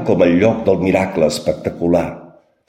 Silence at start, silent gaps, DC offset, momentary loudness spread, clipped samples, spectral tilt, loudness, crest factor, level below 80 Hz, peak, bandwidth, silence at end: 0 s; none; under 0.1%; 8 LU; under 0.1%; -6.5 dB/octave; -16 LUFS; 14 dB; -44 dBFS; -2 dBFS; 15.5 kHz; 0.45 s